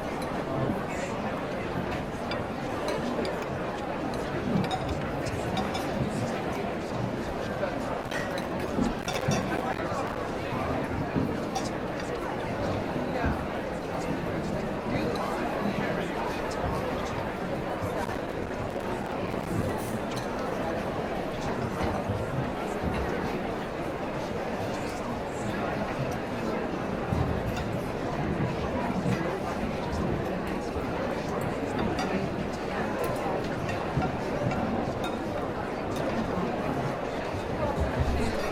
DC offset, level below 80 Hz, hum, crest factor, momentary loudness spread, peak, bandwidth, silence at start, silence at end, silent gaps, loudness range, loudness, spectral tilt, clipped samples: under 0.1%; -44 dBFS; none; 16 dB; 3 LU; -14 dBFS; 17 kHz; 0 s; 0 s; none; 2 LU; -31 LUFS; -6 dB/octave; under 0.1%